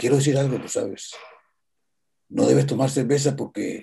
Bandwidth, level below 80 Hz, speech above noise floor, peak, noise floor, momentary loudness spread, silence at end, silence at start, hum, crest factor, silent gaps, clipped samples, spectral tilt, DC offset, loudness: 12.5 kHz; -66 dBFS; 60 dB; -6 dBFS; -81 dBFS; 14 LU; 0 s; 0 s; none; 18 dB; none; under 0.1%; -6 dB/octave; under 0.1%; -22 LUFS